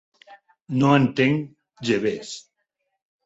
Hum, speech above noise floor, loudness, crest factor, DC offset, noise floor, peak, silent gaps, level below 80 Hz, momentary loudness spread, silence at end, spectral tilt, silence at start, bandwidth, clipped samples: none; 56 dB; -22 LUFS; 20 dB; under 0.1%; -77 dBFS; -4 dBFS; 0.62-0.66 s; -62 dBFS; 19 LU; 0.85 s; -6.5 dB/octave; 0.3 s; 8 kHz; under 0.1%